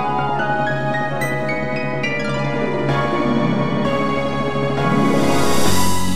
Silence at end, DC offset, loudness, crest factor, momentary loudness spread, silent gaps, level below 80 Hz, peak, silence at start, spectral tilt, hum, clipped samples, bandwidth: 0 s; under 0.1%; -19 LUFS; 14 dB; 4 LU; none; -42 dBFS; -4 dBFS; 0 s; -5 dB/octave; none; under 0.1%; 16 kHz